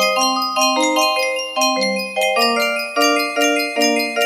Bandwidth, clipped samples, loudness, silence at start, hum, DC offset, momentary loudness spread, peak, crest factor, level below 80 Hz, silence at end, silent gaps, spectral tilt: 15.5 kHz; under 0.1%; -16 LUFS; 0 s; none; under 0.1%; 3 LU; -2 dBFS; 14 dB; -70 dBFS; 0 s; none; -1.5 dB/octave